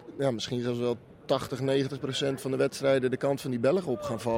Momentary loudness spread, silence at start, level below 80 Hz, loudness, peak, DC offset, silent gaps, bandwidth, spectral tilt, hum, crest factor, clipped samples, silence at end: 5 LU; 0 s; -64 dBFS; -29 LUFS; -12 dBFS; under 0.1%; none; 16.5 kHz; -5.5 dB/octave; none; 16 dB; under 0.1%; 0 s